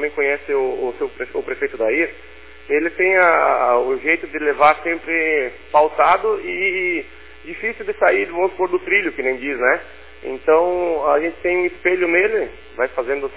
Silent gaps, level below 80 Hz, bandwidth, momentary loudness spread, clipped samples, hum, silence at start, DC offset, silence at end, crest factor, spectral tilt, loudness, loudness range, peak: none; -50 dBFS; 4 kHz; 10 LU; under 0.1%; none; 0 s; 0.7%; 0 s; 18 dB; -7.5 dB/octave; -18 LUFS; 3 LU; -2 dBFS